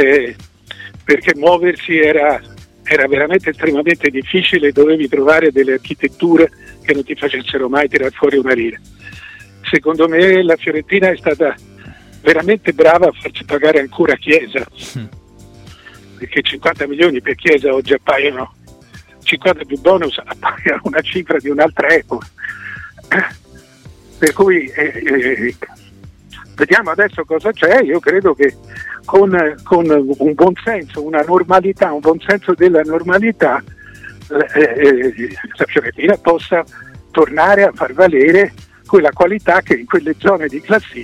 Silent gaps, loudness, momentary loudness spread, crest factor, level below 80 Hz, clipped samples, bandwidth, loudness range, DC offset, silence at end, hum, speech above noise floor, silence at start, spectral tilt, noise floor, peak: none; -13 LUFS; 12 LU; 14 dB; -48 dBFS; under 0.1%; 13.5 kHz; 4 LU; under 0.1%; 0 s; none; 28 dB; 0 s; -5.5 dB/octave; -40 dBFS; 0 dBFS